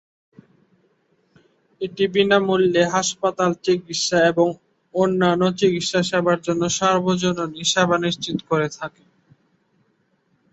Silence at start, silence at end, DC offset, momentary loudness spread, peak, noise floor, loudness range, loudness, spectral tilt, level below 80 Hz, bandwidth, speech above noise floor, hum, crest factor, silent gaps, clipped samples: 1.8 s; 1.65 s; under 0.1%; 8 LU; -4 dBFS; -66 dBFS; 3 LU; -20 LUFS; -4 dB/octave; -60 dBFS; 8.2 kHz; 46 dB; none; 18 dB; none; under 0.1%